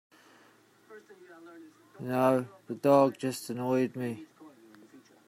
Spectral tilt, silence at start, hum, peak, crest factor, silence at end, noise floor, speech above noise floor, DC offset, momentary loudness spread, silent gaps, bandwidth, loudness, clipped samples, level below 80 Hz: -6.5 dB/octave; 0.9 s; none; -10 dBFS; 22 dB; 0.3 s; -62 dBFS; 32 dB; under 0.1%; 22 LU; none; 16 kHz; -29 LUFS; under 0.1%; -78 dBFS